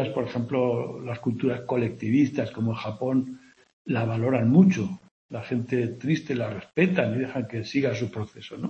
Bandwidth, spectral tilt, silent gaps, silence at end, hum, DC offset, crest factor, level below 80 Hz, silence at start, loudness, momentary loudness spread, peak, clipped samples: 7.8 kHz; -8 dB/octave; 3.73-3.85 s, 5.11-5.29 s; 0 s; none; under 0.1%; 20 dB; -64 dBFS; 0 s; -26 LUFS; 12 LU; -6 dBFS; under 0.1%